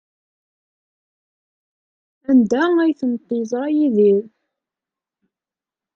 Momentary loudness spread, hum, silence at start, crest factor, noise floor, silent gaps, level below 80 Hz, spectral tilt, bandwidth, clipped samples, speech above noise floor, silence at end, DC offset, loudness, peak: 9 LU; none; 2.3 s; 16 dB; -89 dBFS; none; -68 dBFS; -7 dB/octave; 7.4 kHz; under 0.1%; 73 dB; 1.7 s; under 0.1%; -18 LUFS; -4 dBFS